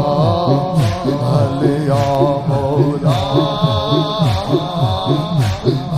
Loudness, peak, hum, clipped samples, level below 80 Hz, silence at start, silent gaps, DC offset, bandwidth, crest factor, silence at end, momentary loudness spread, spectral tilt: -16 LUFS; 0 dBFS; none; under 0.1%; -38 dBFS; 0 s; none; under 0.1%; 14 kHz; 14 dB; 0 s; 3 LU; -7.5 dB/octave